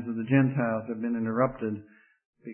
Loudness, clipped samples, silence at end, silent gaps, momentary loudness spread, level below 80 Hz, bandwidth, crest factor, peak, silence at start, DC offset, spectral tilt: -28 LUFS; under 0.1%; 0 s; 2.25-2.33 s; 12 LU; -64 dBFS; 3.3 kHz; 18 dB; -10 dBFS; 0 s; under 0.1%; -12.5 dB/octave